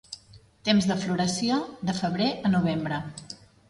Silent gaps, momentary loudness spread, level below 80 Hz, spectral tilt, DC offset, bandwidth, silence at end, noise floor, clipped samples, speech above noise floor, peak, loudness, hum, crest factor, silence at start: none; 18 LU; -58 dBFS; -5 dB/octave; under 0.1%; 11.5 kHz; 0.35 s; -54 dBFS; under 0.1%; 28 dB; -10 dBFS; -26 LUFS; none; 18 dB; 0.1 s